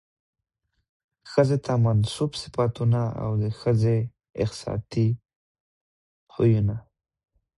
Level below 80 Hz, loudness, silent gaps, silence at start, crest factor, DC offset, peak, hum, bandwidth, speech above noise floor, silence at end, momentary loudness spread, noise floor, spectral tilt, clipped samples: -50 dBFS; -25 LUFS; 5.36-6.27 s; 1.25 s; 20 dB; under 0.1%; -6 dBFS; none; 11.5 kHz; 54 dB; 0.75 s; 8 LU; -77 dBFS; -7.5 dB/octave; under 0.1%